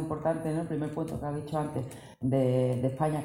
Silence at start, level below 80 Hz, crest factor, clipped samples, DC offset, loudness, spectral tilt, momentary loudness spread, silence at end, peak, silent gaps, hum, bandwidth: 0 s; -56 dBFS; 16 dB; under 0.1%; under 0.1%; -31 LUFS; -8 dB/octave; 8 LU; 0 s; -14 dBFS; none; none; 15.5 kHz